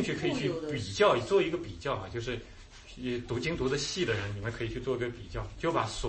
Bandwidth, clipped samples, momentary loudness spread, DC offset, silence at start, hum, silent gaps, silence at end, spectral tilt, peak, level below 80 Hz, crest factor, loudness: 8.8 kHz; under 0.1%; 13 LU; under 0.1%; 0 s; none; none; 0 s; -5 dB/octave; -12 dBFS; -48 dBFS; 20 dB; -32 LUFS